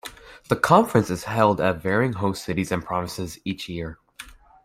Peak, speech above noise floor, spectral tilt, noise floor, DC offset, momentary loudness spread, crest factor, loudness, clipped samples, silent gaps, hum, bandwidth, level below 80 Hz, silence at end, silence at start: -2 dBFS; 23 dB; -6 dB/octave; -45 dBFS; under 0.1%; 22 LU; 22 dB; -23 LUFS; under 0.1%; none; none; 16 kHz; -52 dBFS; 0.3 s; 0.05 s